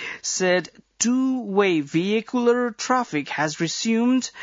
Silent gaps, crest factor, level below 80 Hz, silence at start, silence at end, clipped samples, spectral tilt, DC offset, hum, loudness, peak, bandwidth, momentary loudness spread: none; 16 dB; -72 dBFS; 0 s; 0 s; under 0.1%; -4 dB/octave; under 0.1%; none; -22 LUFS; -6 dBFS; 7.8 kHz; 4 LU